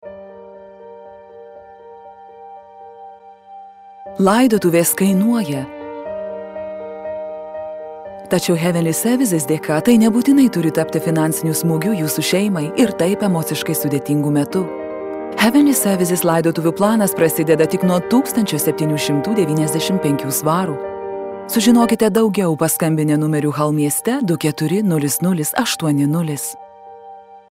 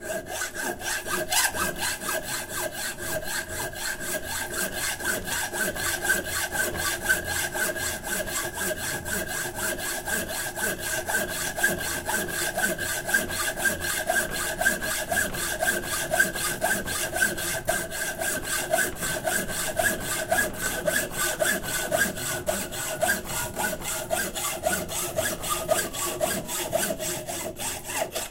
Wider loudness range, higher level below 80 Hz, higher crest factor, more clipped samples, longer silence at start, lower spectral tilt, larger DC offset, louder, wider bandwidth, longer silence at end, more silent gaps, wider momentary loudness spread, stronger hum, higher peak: about the same, 5 LU vs 3 LU; second, -58 dBFS vs -46 dBFS; about the same, 16 dB vs 20 dB; neither; about the same, 0.05 s vs 0 s; first, -5 dB/octave vs -1.5 dB/octave; neither; first, -17 LUFS vs -27 LUFS; about the same, 16 kHz vs 16 kHz; about the same, 0.1 s vs 0 s; neither; first, 15 LU vs 5 LU; neither; first, -2 dBFS vs -8 dBFS